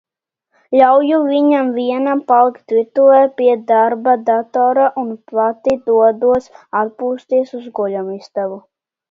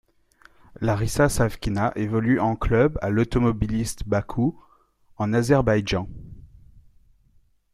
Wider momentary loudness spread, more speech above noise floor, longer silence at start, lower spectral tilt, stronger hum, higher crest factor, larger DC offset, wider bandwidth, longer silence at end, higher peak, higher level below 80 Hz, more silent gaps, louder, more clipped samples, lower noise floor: first, 12 LU vs 8 LU; first, 56 dB vs 38 dB; about the same, 0.7 s vs 0.8 s; about the same, -7 dB/octave vs -6.5 dB/octave; neither; about the same, 14 dB vs 18 dB; neither; second, 7.2 kHz vs 15 kHz; second, 0.5 s vs 1.3 s; first, 0 dBFS vs -6 dBFS; second, -60 dBFS vs -38 dBFS; neither; first, -15 LUFS vs -23 LUFS; neither; first, -70 dBFS vs -60 dBFS